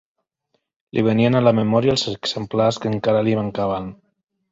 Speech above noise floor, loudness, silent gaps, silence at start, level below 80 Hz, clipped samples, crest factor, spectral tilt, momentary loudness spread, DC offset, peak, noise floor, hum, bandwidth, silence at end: 53 dB; -19 LUFS; none; 0.95 s; -52 dBFS; under 0.1%; 18 dB; -6.5 dB/octave; 9 LU; under 0.1%; -2 dBFS; -71 dBFS; none; 7.8 kHz; 0.55 s